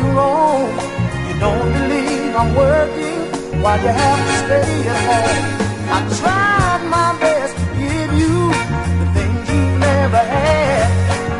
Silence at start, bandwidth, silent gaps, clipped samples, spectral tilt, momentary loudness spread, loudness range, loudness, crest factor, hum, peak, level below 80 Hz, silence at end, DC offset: 0 s; 11.5 kHz; none; under 0.1%; -5.5 dB/octave; 6 LU; 1 LU; -16 LUFS; 14 dB; none; -2 dBFS; -30 dBFS; 0 s; under 0.1%